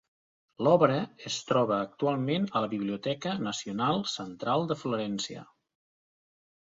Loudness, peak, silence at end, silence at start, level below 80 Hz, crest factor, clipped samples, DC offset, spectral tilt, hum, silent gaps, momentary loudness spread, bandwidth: -29 LUFS; -8 dBFS; 1.2 s; 0.6 s; -70 dBFS; 24 dB; under 0.1%; under 0.1%; -5.5 dB/octave; none; none; 10 LU; 7.8 kHz